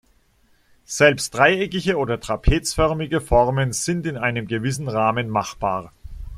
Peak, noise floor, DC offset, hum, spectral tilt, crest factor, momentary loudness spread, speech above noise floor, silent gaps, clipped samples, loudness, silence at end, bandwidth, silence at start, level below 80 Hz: -2 dBFS; -60 dBFS; under 0.1%; none; -4.5 dB/octave; 20 dB; 8 LU; 39 dB; none; under 0.1%; -21 LUFS; 0 s; 15 kHz; 0.9 s; -32 dBFS